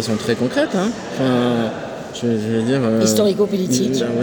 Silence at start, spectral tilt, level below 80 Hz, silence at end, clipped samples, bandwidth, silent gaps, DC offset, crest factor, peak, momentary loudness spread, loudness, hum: 0 s; -5 dB/octave; -56 dBFS; 0 s; under 0.1%; over 20 kHz; none; under 0.1%; 16 dB; -2 dBFS; 7 LU; -18 LUFS; none